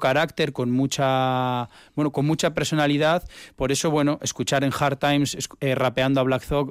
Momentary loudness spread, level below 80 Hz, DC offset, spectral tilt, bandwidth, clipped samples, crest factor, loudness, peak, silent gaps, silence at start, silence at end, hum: 6 LU; -48 dBFS; under 0.1%; -5 dB/octave; 16 kHz; under 0.1%; 12 dB; -23 LUFS; -10 dBFS; none; 0 s; 0 s; none